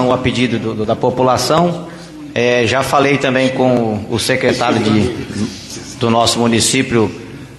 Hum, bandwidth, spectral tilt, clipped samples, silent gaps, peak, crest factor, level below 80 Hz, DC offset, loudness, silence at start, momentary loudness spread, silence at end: none; 12.5 kHz; -4.5 dB/octave; under 0.1%; none; 0 dBFS; 14 dB; -44 dBFS; under 0.1%; -14 LUFS; 0 s; 11 LU; 0 s